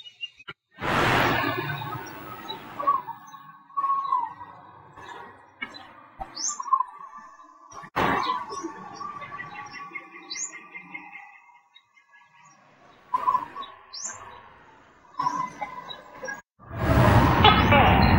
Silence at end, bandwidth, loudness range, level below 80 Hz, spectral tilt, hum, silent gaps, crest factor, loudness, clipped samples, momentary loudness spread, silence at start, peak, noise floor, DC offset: 0 s; 16 kHz; 11 LU; -40 dBFS; -4.5 dB/octave; none; none; 26 dB; -25 LUFS; under 0.1%; 25 LU; 0.05 s; -2 dBFS; -59 dBFS; under 0.1%